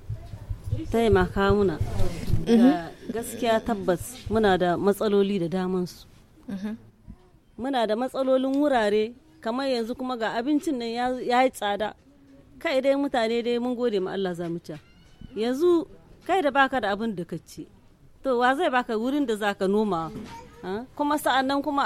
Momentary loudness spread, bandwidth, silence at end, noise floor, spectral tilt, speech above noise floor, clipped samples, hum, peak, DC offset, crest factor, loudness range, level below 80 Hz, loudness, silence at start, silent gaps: 14 LU; 16 kHz; 0 s; -53 dBFS; -6 dB/octave; 28 dB; under 0.1%; none; -8 dBFS; under 0.1%; 18 dB; 3 LU; -42 dBFS; -25 LUFS; 0 s; none